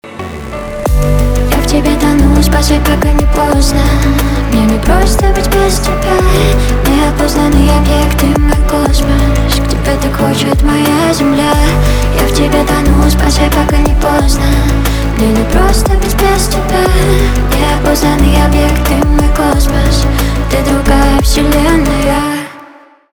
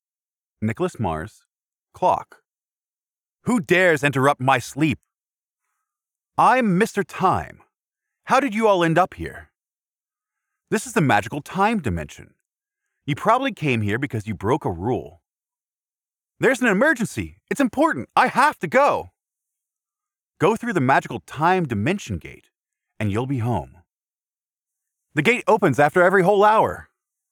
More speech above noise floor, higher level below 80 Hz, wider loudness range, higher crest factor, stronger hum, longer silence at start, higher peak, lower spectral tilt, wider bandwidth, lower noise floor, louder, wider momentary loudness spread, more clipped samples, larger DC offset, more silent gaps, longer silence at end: second, 29 dB vs over 70 dB; first, -12 dBFS vs -52 dBFS; second, 1 LU vs 5 LU; second, 8 dB vs 20 dB; neither; second, 0.05 s vs 0.6 s; first, 0 dBFS vs -4 dBFS; about the same, -5.5 dB/octave vs -6 dB/octave; about the same, over 20 kHz vs 19 kHz; second, -37 dBFS vs under -90 dBFS; first, -10 LUFS vs -20 LUFS; second, 3 LU vs 13 LU; neither; neither; neither; about the same, 0.45 s vs 0.5 s